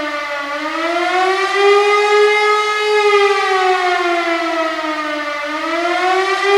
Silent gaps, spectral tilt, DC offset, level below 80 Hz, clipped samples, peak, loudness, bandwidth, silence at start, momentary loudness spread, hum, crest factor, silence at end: none; -1 dB/octave; under 0.1%; -58 dBFS; under 0.1%; 0 dBFS; -14 LUFS; 12.5 kHz; 0 s; 9 LU; none; 14 dB; 0 s